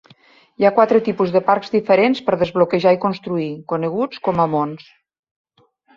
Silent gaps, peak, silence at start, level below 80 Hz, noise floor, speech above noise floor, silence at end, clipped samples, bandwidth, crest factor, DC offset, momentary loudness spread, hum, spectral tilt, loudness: none; -2 dBFS; 0.6 s; -58 dBFS; -57 dBFS; 40 dB; 1.2 s; under 0.1%; 7.2 kHz; 16 dB; under 0.1%; 9 LU; none; -8 dB/octave; -18 LUFS